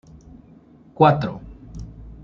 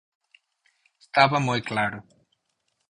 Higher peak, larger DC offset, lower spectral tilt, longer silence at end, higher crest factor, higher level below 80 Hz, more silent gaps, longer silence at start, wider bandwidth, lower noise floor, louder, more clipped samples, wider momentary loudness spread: about the same, -2 dBFS vs -2 dBFS; neither; first, -8.5 dB/octave vs -5 dB/octave; second, 0.1 s vs 0.9 s; about the same, 22 dB vs 24 dB; first, -44 dBFS vs -62 dBFS; neither; second, 1 s vs 1.15 s; second, 7 kHz vs 11 kHz; second, -49 dBFS vs -75 dBFS; first, -19 LUFS vs -23 LUFS; neither; first, 23 LU vs 9 LU